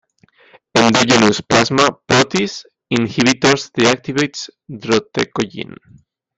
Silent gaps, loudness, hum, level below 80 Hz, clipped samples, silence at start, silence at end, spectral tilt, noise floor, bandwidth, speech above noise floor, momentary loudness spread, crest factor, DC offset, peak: none; -15 LUFS; none; -50 dBFS; under 0.1%; 0.75 s; 0.75 s; -4 dB/octave; -52 dBFS; 8.8 kHz; 36 dB; 16 LU; 16 dB; under 0.1%; 0 dBFS